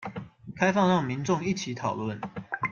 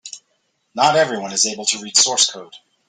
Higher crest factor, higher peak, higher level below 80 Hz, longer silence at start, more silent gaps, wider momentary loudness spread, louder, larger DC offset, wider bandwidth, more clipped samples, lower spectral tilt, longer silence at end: about the same, 20 dB vs 20 dB; second, -8 dBFS vs 0 dBFS; first, -62 dBFS vs -68 dBFS; about the same, 0 s vs 0.05 s; neither; second, 15 LU vs 19 LU; second, -28 LUFS vs -16 LUFS; neither; second, 7.2 kHz vs 12 kHz; neither; first, -5.5 dB/octave vs -0.5 dB/octave; second, 0 s vs 0.3 s